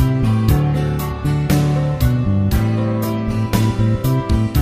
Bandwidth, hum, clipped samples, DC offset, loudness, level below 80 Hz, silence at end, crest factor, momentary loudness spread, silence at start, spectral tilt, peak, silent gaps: 15.5 kHz; none; under 0.1%; under 0.1%; -17 LUFS; -26 dBFS; 0 s; 16 dB; 4 LU; 0 s; -7.5 dB/octave; 0 dBFS; none